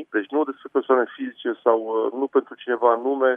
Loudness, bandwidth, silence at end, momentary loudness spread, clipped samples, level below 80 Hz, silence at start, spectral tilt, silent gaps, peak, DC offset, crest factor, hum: -23 LUFS; 3.7 kHz; 0 s; 8 LU; under 0.1%; -84 dBFS; 0 s; -7 dB/octave; none; -4 dBFS; under 0.1%; 20 dB; none